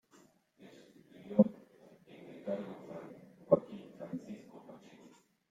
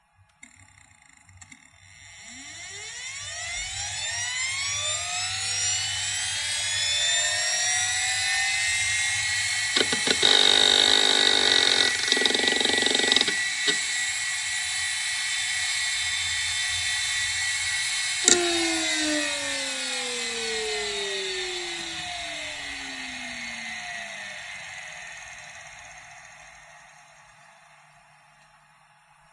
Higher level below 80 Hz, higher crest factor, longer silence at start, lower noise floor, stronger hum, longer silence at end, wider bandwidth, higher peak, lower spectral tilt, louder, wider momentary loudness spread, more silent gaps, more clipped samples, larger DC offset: second, -80 dBFS vs -60 dBFS; about the same, 28 dB vs 26 dB; second, 0.6 s vs 1.35 s; first, -66 dBFS vs -58 dBFS; neither; second, 0.75 s vs 2.3 s; second, 7.6 kHz vs 11.5 kHz; second, -10 dBFS vs 0 dBFS; first, -9 dB/octave vs 0 dB/octave; second, -35 LUFS vs -23 LUFS; first, 27 LU vs 18 LU; neither; neither; neither